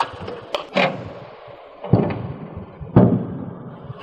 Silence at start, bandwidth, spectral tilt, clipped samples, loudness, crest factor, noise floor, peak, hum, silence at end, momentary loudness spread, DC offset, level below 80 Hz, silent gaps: 0 s; 8 kHz; -8 dB/octave; under 0.1%; -21 LUFS; 22 dB; -41 dBFS; 0 dBFS; none; 0 s; 21 LU; under 0.1%; -44 dBFS; none